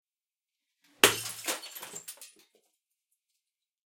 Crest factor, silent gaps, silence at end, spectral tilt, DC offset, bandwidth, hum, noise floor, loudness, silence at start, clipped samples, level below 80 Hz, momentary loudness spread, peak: 34 dB; none; 1.65 s; -0.5 dB/octave; under 0.1%; 16.5 kHz; none; under -90 dBFS; -27 LUFS; 1.05 s; under 0.1%; -72 dBFS; 21 LU; -2 dBFS